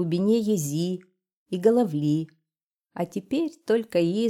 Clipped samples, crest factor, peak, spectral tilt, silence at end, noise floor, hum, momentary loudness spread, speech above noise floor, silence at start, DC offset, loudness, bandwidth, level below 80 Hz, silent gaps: under 0.1%; 18 dB; -8 dBFS; -6.5 dB/octave; 0 s; -89 dBFS; none; 12 LU; 65 dB; 0 s; under 0.1%; -25 LUFS; 16.5 kHz; -70 dBFS; 1.37-1.46 s, 2.63-2.71 s